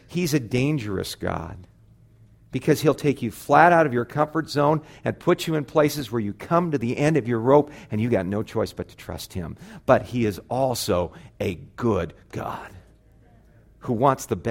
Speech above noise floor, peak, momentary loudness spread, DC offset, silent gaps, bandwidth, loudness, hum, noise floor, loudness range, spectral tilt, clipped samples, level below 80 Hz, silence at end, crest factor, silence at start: 31 dB; -2 dBFS; 14 LU; under 0.1%; none; 16.5 kHz; -23 LUFS; none; -54 dBFS; 7 LU; -6 dB/octave; under 0.1%; -50 dBFS; 0 s; 22 dB; 0.1 s